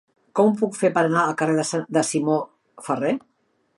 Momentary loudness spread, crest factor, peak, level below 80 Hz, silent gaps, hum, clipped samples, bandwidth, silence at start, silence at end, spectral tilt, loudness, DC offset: 9 LU; 18 dB; -6 dBFS; -72 dBFS; none; none; under 0.1%; 11.5 kHz; 0.35 s; 0.6 s; -5 dB/octave; -22 LUFS; under 0.1%